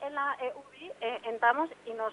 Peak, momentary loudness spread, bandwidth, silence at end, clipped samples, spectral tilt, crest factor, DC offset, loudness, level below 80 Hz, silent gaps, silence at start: -12 dBFS; 14 LU; 11 kHz; 0 s; under 0.1%; -4 dB/octave; 20 dB; under 0.1%; -32 LUFS; -80 dBFS; none; 0 s